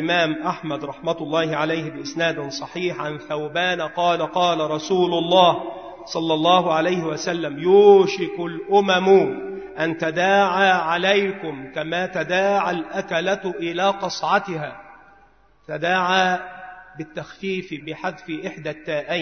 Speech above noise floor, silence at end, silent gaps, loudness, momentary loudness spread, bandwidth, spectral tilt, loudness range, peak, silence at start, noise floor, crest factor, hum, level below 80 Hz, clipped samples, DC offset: 35 dB; 0 s; none; -21 LUFS; 15 LU; 6.6 kHz; -5 dB/octave; 7 LU; -2 dBFS; 0 s; -56 dBFS; 20 dB; none; -62 dBFS; under 0.1%; 0.1%